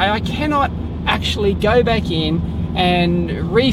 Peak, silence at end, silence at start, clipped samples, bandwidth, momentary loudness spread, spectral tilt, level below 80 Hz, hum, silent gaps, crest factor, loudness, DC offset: -2 dBFS; 0 s; 0 s; under 0.1%; 13 kHz; 6 LU; -6.5 dB/octave; -30 dBFS; none; none; 14 dB; -17 LUFS; under 0.1%